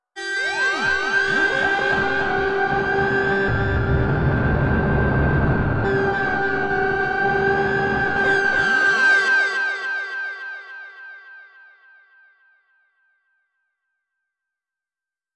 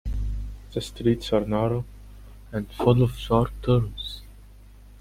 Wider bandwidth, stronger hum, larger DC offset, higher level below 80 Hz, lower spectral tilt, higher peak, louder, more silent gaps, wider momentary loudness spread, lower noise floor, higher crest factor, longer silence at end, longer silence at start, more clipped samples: second, 10 kHz vs 15 kHz; second, none vs 50 Hz at -40 dBFS; neither; about the same, -36 dBFS vs -36 dBFS; second, -6 dB/octave vs -7.5 dB/octave; about the same, -8 dBFS vs -6 dBFS; first, -19 LUFS vs -25 LUFS; neither; second, 10 LU vs 13 LU; first, under -90 dBFS vs -47 dBFS; second, 14 dB vs 20 dB; first, 3.7 s vs 0.05 s; about the same, 0.15 s vs 0.05 s; neither